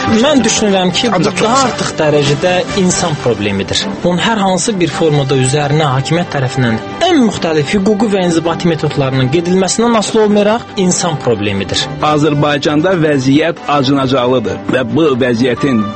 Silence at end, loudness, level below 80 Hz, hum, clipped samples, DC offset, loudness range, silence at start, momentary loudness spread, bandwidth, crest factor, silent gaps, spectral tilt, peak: 0 s; -12 LUFS; -42 dBFS; none; under 0.1%; under 0.1%; 1 LU; 0 s; 4 LU; 8.8 kHz; 12 dB; none; -5 dB/octave; 0 dBFS